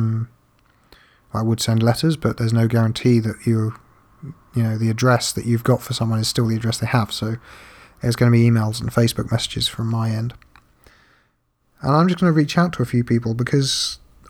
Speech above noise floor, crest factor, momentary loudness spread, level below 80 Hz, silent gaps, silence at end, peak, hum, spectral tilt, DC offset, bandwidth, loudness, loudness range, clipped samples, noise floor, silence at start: 46 dB; 16 dB; 10 LU; -48 dBFS; none; 0.35 s; -4 dBFS; none; -6 dB/octave; under 0.1%; 17 kHz; -20 LUFS; 2 LU; under 0.1%; -65 dBFS; 0 s